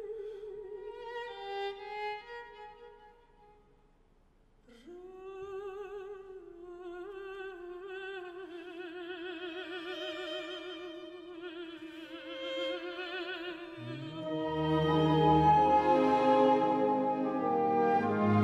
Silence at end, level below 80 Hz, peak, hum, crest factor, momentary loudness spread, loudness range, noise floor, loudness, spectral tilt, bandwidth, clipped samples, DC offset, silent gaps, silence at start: 0 s; -60 dBFS; -14 dBFS; none; 18 dB; 21 LU; 20 LU; -65 dBFS; -32 LUFS; -7.5 dB/octave; 9.2 kHz; under 0.1%; under 0.1%; none; 0 s